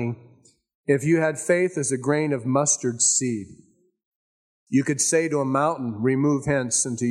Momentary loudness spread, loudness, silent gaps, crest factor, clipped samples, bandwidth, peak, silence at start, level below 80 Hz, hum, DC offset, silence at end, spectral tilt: 6 LU; -22 LUFS; 0.75-0.84 s, 4.05-4.67 s; 16 dB; under 0.1%; 13 kHz; -6 dBFS; 0 s; -60 dBFS; none; under 0.1%; 0 s; -4.5 dB/octave